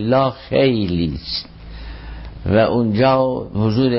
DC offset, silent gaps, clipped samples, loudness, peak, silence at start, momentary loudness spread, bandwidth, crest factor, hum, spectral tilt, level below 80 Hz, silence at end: under 0.1%; none; under 0.1%; -18 LUFS; -4 dBFS; 0 s; 20 LU; 5.8 kHz; 12 dB; none; -11 dB/octave; -36 dBFS; 0 s